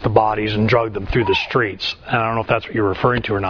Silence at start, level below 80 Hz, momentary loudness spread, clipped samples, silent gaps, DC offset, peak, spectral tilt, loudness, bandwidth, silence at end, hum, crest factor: 0 s; -36 dBFS; 4 LU; under 0.1%; none; under 0.1%; 0 dBFS; -7 dB/octave; -18 LUFS; 5.4 kHz; 0 s; none; 18 dB